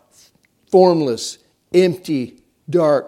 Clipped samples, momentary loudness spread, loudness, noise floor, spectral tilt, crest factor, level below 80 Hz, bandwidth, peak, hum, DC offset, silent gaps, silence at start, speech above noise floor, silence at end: under 0.1%; 12 LU; -17 LUFS; -56 dBFS; -6 dB/octave; 18 dB; -66 dBFS; 13 kHz; 0 dBFS; none; under 0.1%; none; 0.7 s; 41 dB; 0 s